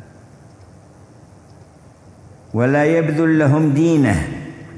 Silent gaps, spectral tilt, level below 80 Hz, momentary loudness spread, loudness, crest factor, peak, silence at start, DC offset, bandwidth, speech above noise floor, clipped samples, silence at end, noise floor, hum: none; -8 dB/octave; -42 dBFS; 12 LU; -16 LUFS; 16 dB; -2 dBFS; 2.55 s; under 0.1%; 11 kHz; 30 dB; under 0.1%; 0 s; -45 dBFS; none